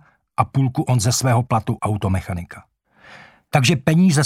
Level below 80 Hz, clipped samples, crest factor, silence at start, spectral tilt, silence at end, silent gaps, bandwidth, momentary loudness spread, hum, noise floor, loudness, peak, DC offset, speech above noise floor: -46 dBFS; under 0.1%; 18 dB; 0.4 s; -5.5 dB/octave; 0 s; none; 16 kHz; 13 LU; none; -47 dBFS; -19 LUFS; 0 dBFS; under 0.1%; 29 dB